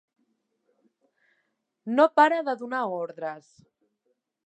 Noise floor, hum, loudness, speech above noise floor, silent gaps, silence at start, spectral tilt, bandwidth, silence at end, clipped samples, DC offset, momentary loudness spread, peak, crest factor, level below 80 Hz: -76 dBFS; none; -24 LUFS; 52 dB; none; 1.85 s; -5.5 dB/octave; 8.6 kHz; 1.05 s; under 0.1%; under 0.1%; 18 LU; -6 dBFS; 22 dB; -86 dBFS